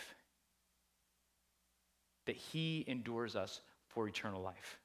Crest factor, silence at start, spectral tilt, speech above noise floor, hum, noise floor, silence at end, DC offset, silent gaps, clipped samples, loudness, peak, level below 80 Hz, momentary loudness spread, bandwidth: 22 dB; 0 s; -5 dB/octave; 37 dB; none; -80 dBFS; 0.05 s; under 0.1%; none; under 0.1%; -44 LUFS; -24 dBFS; -74 dBFS; 9 LU; 16 kHz